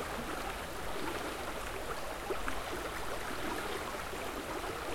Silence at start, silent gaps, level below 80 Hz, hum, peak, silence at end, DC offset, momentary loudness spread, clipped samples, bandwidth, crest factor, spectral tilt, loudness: 0 s; none; -50 dBFS; none; -18 dBFS; 0 s; under 0.1%; 2 LU; under 0.1%; 16.5 kHz; 20 dB; -3.5 dB/octave; -39 LUFS